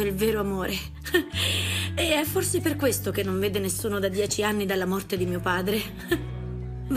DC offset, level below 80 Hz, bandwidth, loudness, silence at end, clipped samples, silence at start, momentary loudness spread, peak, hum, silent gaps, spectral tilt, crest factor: under 0.1%; -44 dBFS; 15.5 kHz; -26 LUFS; 0 s; under 0.1%; 0 s; 6 LU; -8 dBFS; none; none; -4 dB/octave; 18 dB